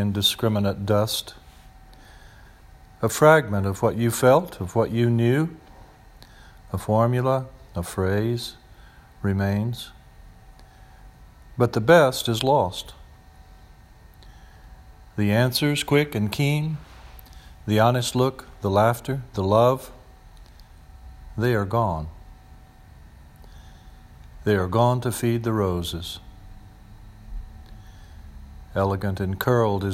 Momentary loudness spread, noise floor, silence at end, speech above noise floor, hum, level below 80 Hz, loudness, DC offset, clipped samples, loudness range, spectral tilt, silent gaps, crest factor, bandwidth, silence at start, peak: 17 LU; -49 dBFS; 0 s; 27 dB; none; -46 dBFS; -22 LUFS; under 0.1%; under 0.1%; 8 LU; -5.5 dB/octave; none; 22 dB; 16 kHz; 0 s; -2 dBFS